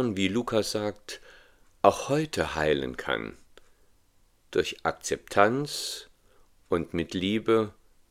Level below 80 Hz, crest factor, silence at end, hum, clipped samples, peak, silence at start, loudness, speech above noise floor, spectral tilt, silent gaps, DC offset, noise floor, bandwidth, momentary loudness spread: -56 dBFS; 26 dB; 0.4 s; none; under 0.1%; -4 dBFS; 0 s; -28 LUFS; 36 dB; -4.5 dB/octave; none; under 0.1%; -63 dBFS; 16 kHz; 11 LU